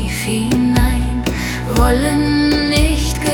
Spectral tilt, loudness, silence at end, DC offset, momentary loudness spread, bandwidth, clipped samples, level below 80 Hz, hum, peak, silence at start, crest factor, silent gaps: -5 dB/octave; -16 LUFS; 0 s; under 0.1%; 5 LU; 18 kHz; under 0.1%; -20 dBFS; none; -2 dBFS; 0 s; 12 dB; none